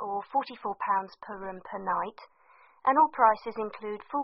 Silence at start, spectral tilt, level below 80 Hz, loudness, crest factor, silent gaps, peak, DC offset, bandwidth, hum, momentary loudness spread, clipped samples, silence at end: 0 s; -3 dB/octave; -70 dBFS; -29 LUFS; 22 dB; none; -8 dBFS; under 0.1%; 5.8 kHz; none; 16 LU; under 0.1%; 0 s